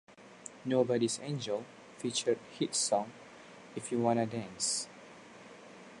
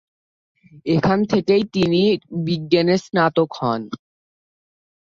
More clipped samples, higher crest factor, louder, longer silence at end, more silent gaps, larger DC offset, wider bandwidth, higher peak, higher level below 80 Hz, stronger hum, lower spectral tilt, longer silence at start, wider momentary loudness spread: neither; about the same, 20 dB vs 18 dB; second, -33 LUFS vs -19 LUFS; second, 0 s vs 1.1 s; neither; neither; first, 11.5 kHz vs 7.6 kHz; second, -16 dBFS vs -4 dBFS; second, -76 dBFS vs -54 dBFS; neither; second, -3.5 dB/octave vs -7 dB/octave; second, 0.1 s vs 0.75 s; first, 22 LU vs 9 LU